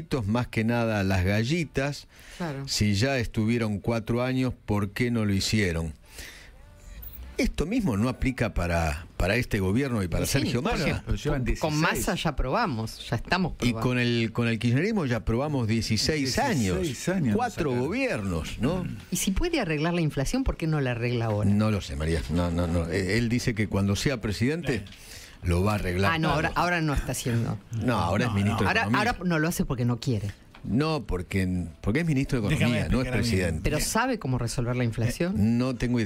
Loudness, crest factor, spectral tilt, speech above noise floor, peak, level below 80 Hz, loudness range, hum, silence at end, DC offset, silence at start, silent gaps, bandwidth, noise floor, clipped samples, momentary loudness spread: -27 LUFS; 18 dB; -5.5 dB/octave; 22 dB; -8 dBFS; -38 dBFS; 2 LU; none; 0 s; under 0.1%; 0 s; none; 16 kHz; -48 dBFS; under 0.1%; 6 LU